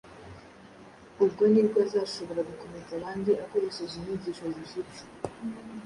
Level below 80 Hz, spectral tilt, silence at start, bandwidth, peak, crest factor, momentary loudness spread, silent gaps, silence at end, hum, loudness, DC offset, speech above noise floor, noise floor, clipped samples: -62 dBFS; -6.5 dB/octave; 0.05 s; 11 kHz; -12 dBFS; 18 dB; 20 LU; none; 0 s; none; -29 LUFS; under 0.1%; 22 dB; -51 dBFS; under 0.1%